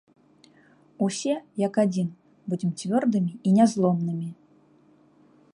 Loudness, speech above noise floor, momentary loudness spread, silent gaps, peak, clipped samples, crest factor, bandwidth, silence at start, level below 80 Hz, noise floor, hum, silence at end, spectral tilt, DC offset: -25 LUFS; 35 dB; 13 LU; none; -8 dBFS; under 0.1%; 18 dB; 11 kHz; 1 s; -72 dBFS; -58 dBFS; 50 Hz at -70 dBFS; 1.2 s; -7 dB/octave; under 0.1%